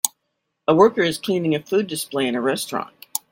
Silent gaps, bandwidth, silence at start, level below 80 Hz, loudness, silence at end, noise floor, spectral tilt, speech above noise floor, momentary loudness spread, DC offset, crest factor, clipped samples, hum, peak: none; 17 kHz; 0.05 s; -64 dBFS; -21 LUFS; 0.15 s; -76 dBFS; -4 dB/octave; 56 dB; 12 LU; under 0.1%; 22 dB; under 0.1%; none; 0 dBFS